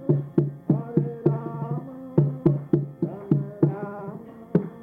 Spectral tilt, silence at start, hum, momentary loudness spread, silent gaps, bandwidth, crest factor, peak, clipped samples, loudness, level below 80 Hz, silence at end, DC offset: -12.5 dB/octave; 0 s; none; 10 LU; none; 2.9 kHz; 18 dB; -8 dBFS; under 0.1%; -26 LUFS; -58 dBFS; 0 s; under 0.1%